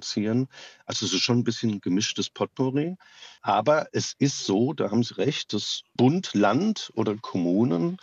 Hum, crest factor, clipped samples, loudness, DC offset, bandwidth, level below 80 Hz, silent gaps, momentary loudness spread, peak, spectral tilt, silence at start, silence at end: none; 16 dB; under 0.1%; -25 LUFS; under 0.1%; 8 kHz; -76 dBFS; none; 7 LU; -8 dBFS; -5 dB/octave; 0 s; 0.05 s